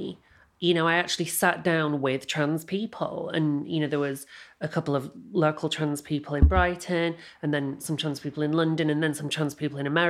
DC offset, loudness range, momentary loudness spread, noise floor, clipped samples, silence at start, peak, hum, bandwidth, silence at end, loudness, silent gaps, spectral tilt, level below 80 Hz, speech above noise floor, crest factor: under 0.1%; 3 LU; 9 LU; -48 dBFS; under 0.1%; 0 s; -6 dBFS; none; 15.5 kHz; 0 s; -27 LUFS; none; -5 dB/octave; -36 dBFS; 22 dB; 20 dB